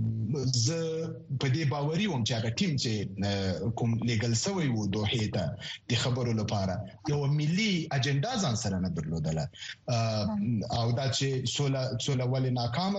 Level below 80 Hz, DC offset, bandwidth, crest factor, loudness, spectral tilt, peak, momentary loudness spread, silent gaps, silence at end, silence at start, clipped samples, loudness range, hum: -56 dBFS; under 0.1%; 8.4 kHz; 16 dB; -30 LUFS; -5 dB/octave; -14 dBFS; 5 LU; none; 0 s; 0 s; under 0.1%; 1 LU; none